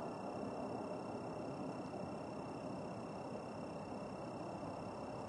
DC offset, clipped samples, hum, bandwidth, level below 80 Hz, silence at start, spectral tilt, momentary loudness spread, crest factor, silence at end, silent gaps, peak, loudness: under 0.1%; under 0.1%; none; 11.5 kHz; -72 dBFS; 0 s; -7 dB/octave; 2 LU; 14 dB; 0 s; none; -32 dBFS; -47 LUFS